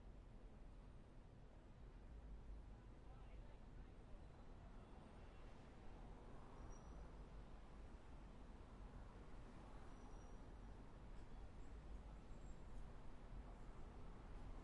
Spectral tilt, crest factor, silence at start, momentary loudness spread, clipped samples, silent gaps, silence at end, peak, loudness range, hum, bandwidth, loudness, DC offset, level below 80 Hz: -6.5 dB/octave; 14 dB; 0 s; 4 LU; under 0.1%; none; 0 s; -44 dBFS; 2 LU; none; 10.5 kHz; -62 LUFS; under 0.1%; -60 dBFS